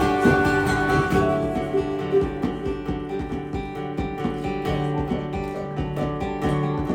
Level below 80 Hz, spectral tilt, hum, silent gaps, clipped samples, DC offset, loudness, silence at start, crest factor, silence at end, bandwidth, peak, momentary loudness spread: -38 dBFS; -7 dB/octave; none; none; under 0.1%; under 0.1%; -24 LUFS; 0 s; 18 dB; 0 s; 16.5 kHz; -6 dBFS; 9 LU